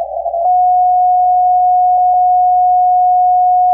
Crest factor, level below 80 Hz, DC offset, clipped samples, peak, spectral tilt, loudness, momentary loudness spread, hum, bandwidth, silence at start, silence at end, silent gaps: 4 dB; -48 dBFS; under 0.1%; under 0.1%; -6 dBFS; -8 dB/octave; -11 LUFS; 1 LU; none; 1 kHz; 0 s; 0 s; none